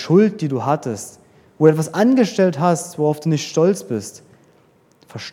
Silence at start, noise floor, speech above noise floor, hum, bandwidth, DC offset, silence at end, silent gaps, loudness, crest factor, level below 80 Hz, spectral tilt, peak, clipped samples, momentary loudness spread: 0 s; -55 dBFS; 38 dB; none; 16 kHz; under 0.1%; 0 s; none; -18 LUFS; 18 dB; -68 dBFS; -6.5 dB/octave; 0 dBFS; under 0.1%; 15 LU